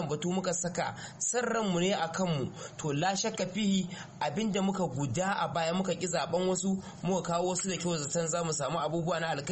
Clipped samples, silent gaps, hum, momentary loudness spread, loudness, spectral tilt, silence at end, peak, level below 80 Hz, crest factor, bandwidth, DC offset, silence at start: under 0.1%; none; none; 5 LU; -31 LUFS; -4.5 dB/octave; 0 s; -18 dBFS; -62 dBFS; 14 dB; 8.8 kHz; under 0.1%; 0 s